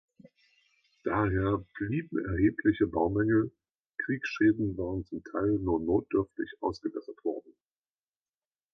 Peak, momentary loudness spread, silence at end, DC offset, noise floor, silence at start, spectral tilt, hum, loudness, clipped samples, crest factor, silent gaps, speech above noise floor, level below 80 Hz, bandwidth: -14 dBFS; 11 LU; 1.35 s; under 0.1%; under -90 dBFS; 1.05 s; -8.5 dB/octave; none; -30 LUFS; under 0.1%; 18 dB; none; over 61 dB; -50 dBFS; 6.4 kHz